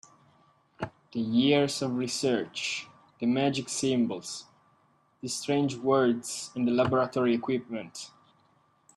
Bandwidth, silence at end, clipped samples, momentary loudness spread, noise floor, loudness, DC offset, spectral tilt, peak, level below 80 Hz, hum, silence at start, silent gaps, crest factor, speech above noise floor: 12.5 kHz; 0.9 s; under 0.1%; 15 LU; -67 dBFS; -28 LUFS; under 0.1%; -4.5 dB/octave; -12 dBFS; -70 dBFS; none; 0.8 s; none; 18 dB; 39 dB